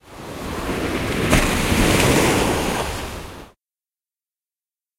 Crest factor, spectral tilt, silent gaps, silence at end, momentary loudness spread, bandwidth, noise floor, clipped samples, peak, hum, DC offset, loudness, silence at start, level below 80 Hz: 22 dB; -4 dB/octave; none; 1.55 s; 16 LU; 16 kHz; under -90 dBFS; under 0.1%; 0 dBFS; none; under 0.1%; -19 LUFS; 0.05 s; -30 dBFS